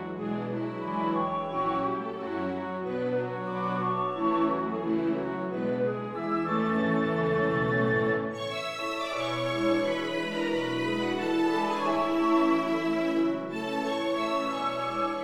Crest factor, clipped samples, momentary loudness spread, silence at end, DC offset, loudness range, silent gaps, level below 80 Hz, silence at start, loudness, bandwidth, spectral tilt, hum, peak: 16 dB; under 0.1%; 7 LU; 0 s; under 0.1%; 3 LU; none; -62 dBFS; 0 s; -29 LUFS; 12 kHz; -6.5 dB/octave; none; -14 dBFS